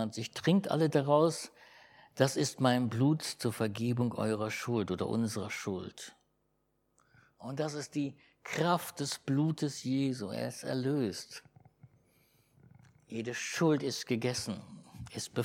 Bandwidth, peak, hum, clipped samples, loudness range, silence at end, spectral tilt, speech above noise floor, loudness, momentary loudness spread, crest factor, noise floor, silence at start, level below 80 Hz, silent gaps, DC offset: 17 kHz; -12 dBFS; none; under 0.1%; 8 LU; 0 s; -5.5 dB/octave; 45 dB; -33 LUFS; 15 LU; 22 dB; -77 dBFS; 0 s; -72 dBFS; none; under 0.1%